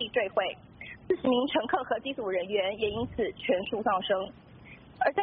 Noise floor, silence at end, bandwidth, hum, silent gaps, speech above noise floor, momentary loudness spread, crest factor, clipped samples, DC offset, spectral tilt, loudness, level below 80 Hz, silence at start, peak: -51 dBFS; 0 s; 4.8 kHz; none; none; 21 dB; 17 LU; 18 dB; under 0.1%; under 0.1%; -2 dB/octave; -30 LUFS; -58 dBFS; 0 s; -12 dBFS